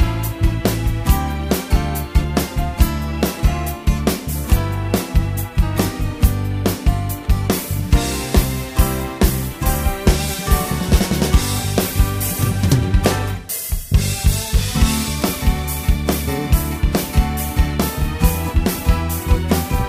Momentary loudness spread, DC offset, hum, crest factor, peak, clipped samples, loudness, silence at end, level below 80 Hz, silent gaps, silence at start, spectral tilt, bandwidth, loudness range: 4 LU; under 0.1%; none; 18 dB; 0 dBFS; under 0.1%; -19 LUFS; 0 s; -20 dBFS; none; 0 s; -5 dB/octave; 15.5 kHz; 2 LU